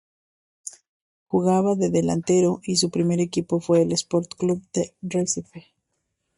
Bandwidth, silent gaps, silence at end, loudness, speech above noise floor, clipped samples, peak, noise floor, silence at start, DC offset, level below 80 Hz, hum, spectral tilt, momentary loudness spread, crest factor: 11.5 kHz; 0.88-1.26 s; 0.8 s; -23 LUFS; 54 dB; under 0.1%; -8 dBFS; -77 dBFS; 0.65 s; under 0.1%; -62 dBFS; none; -5.5 dB/octave; 8 LU; 16 dB